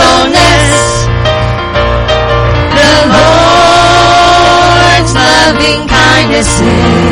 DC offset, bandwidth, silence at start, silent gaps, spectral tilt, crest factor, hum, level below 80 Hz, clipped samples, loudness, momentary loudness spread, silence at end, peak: under 0.1%; 13 kHz; 0 s; none; -4 dB/octave; 6 dB; none; -18 dBFS; 1%; -6 LUFS; 6 LU; 0 s; 0 dBFS